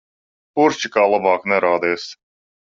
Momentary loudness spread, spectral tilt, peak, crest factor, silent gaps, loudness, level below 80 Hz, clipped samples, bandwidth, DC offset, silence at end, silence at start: 11 LU; -4 dB/octave; -2 dBFS; 18 dB; none; -18 LUFS; -64 dBFS; under 0.1%; 7.6 kHz; under 0.1%; 0.6 s; 0.55 s